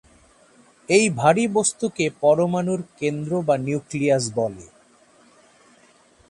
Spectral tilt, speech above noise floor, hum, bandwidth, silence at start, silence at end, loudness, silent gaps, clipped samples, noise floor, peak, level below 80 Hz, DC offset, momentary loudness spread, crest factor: -5 dB/octave; 35 dB; none; 11.5 kHz; 0.9 s; 1.65 s; -21 LUFS; none; under 0.1%; -55 dBFS; -2 dBFS; -60 dBFS; under 0.1%; 9 LU; 20 dB